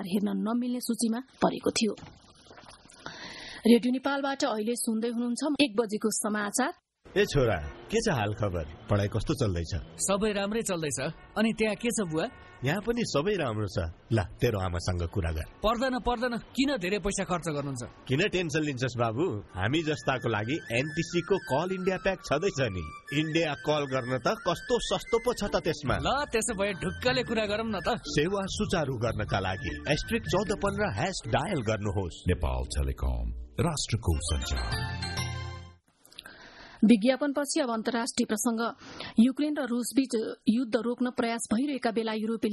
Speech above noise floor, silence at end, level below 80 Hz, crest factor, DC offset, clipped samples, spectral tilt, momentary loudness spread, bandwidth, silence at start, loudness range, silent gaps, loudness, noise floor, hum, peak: 28 dB; 0 s; -44 dBFS; 22 dB; under 0.1%; under 0.1%; -5 dB/octave; 6 LU; 12.5 kHz; 0 s; 3 LU; none; -29 LUFS; -57 dBFS; none; -8 dBFS